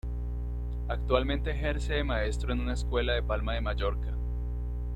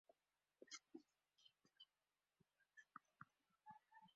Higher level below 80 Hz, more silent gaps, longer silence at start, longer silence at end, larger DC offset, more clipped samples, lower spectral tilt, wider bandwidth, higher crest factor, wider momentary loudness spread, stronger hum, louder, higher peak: first, -32 dBFS vs under -90 dBFS; neither; about the same, 0.05 s vs 0.1 s; about the same, 0 s vs 0 s; neither; neither; first, -6.5 dB/octave vs -1.5 dB/octave; first, 9.2 kHz vs 7.4 kHz; second, 18 dB vs 26 dB; about the same, 8 LU vs 9 LU; first, 60 Hz at -30 dBFS vs none; first, -32 LUFS vs -65 LUFS; first, -12 dBFS vs -44 dBFS